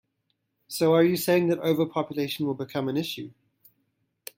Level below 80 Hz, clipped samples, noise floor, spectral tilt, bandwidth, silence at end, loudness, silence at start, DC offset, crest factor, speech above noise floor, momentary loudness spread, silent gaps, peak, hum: -70 dBFS; under 0.1%; -77 dBFS; -5.5 dB/octave; 16.5 kHz; 1.05 s; -25 LUFS; 0.7 s; under 0.1%; 18 dB; 52 dB; 16 LU; none; -8 dBFS; none